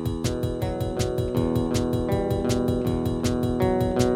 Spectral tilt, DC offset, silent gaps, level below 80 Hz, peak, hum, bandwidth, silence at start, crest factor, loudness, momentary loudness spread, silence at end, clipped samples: -6.5 dB/octave; under 0.1%; none; -36 dBFS; -6 dBFS; none; 16 kHz; 0 s; 18 dB; -25 LUFS; 4 LU; 0 s; under 0.1%